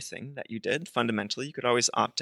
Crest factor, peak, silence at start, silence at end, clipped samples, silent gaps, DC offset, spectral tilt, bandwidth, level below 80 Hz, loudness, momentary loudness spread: 20 dB; -10 dBFS; 0 s; 0 s; under 0.1%; none; under 0.1%; -3 dB/octave; 12.5 kHz; -76 dBFS; -29 LUFS; 14 LU